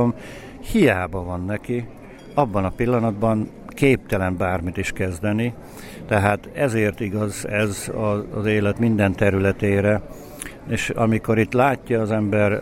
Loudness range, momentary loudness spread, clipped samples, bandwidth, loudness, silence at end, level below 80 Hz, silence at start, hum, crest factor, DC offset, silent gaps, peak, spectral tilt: 2 LU; 12 LU; under 0.1%; 16 kHz; -21 LUFS; 0 s; -42 dBFS; 0 s; none; 18 dB; under 0.1%; none; -2 dBFS; -6.5 dB/octave